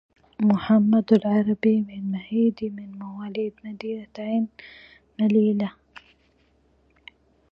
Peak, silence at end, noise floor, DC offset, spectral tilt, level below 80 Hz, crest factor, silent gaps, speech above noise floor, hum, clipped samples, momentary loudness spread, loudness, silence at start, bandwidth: -6 dBFS; 1.8 s; -63 dBFS; under 0.1%; -9.5 dB/octave; -62 dBFS; 20 dB; none; 40 dB; none; under 0.1%; 16 LU; -23 LUFS; 0.4 s; 5.4 kHz